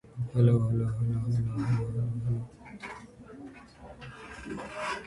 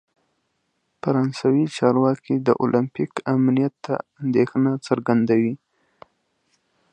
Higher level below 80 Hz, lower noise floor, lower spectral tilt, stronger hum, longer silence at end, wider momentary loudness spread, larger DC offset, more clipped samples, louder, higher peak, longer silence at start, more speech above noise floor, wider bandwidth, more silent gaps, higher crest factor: first, -52 dBFS vs -66 dBFS; second, -49 dBFS vs -72 dBFS; about the same, -8 dB/octave vs -8 dB/octave; neither; second, 0 s vs 1.35 s; first, 22 LU vs 8 LU; neither; neither; second, -30 LUFS vs -21 LUFS; second, -12 dBFS vs -2 dBFS; second, 0.05 s vs 1.05 s; second, 21 dB vs 52 dB; first, 11 kHz vs 9.6 kHz; neither; about the same, 18 dB vs 20 dB